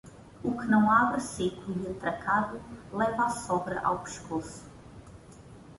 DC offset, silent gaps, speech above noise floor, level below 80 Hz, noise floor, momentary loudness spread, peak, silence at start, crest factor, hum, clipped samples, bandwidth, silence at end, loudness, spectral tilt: under 0.1%; none; 21 dB; -56 dBFS; -50 dBFS; 21 LU; -10 dBFS; 0.05 s; 22 dB; none; under 0.1%; 11.5 kHz; 0 s; -29 LUFS; -5.5 dB/octave